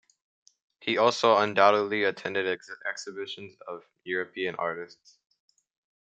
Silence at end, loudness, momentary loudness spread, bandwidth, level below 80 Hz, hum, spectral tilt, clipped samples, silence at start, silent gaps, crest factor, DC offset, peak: 1.1 s; -27 LUFS; 19 LU; 8.8 kHz; -80 dBFS; none; -4 dB/octave; under 0.1%; 0.85 s; none; 24 dB; under 0.1%; -6 dBFS